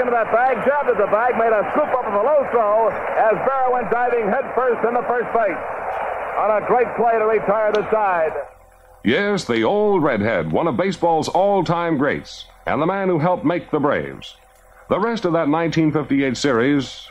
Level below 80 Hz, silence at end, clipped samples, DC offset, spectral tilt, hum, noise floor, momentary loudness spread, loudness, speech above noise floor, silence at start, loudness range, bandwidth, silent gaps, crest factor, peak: -52 dBFS; 0 s; under 0.1%; under 0.1%; -6 dB/octave; none; -48 dBFS; 7 LU; -19 LUFS; 29 dB; 0 s; 3 LU; 12 kHz; none; 12 dB; -6 dBFS